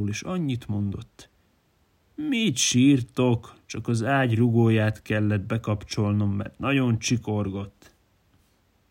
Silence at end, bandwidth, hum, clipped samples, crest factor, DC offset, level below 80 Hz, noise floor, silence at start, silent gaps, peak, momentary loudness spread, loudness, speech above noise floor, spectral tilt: 1.2 s; 16 kHz; none; under 0.1%; 16 dB; under 0.1%; -56 dBFS; -65 dBFS; 0 s; none; -8 dBFS; 12 LU; -24 LUFS; 41 dB; -5.5 dB/octave